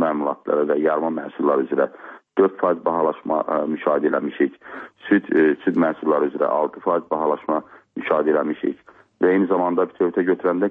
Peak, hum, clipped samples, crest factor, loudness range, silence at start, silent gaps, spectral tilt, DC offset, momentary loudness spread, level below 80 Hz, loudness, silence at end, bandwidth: -6 dBFS; none; under 0.1%; 16 dB; 1 LU; 0 s; none; -9.5 dB/octave; under 0.1%; 8 LU; -68 dBFS; -21 LUFS; 0 s; 3.9 kHz